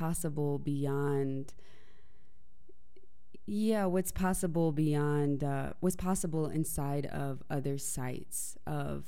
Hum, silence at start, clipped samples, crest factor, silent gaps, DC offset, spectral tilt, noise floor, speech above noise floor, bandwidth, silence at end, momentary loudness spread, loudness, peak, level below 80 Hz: none; 0 s; under 0.1%; 16 dB; none; 1%; -6.5 dB/octave; -66 dBFS; 33 dB; 16.5 kHz; 0.05 s; 8 LU; -34 LUFS; -18 dBFS; -52 dBFS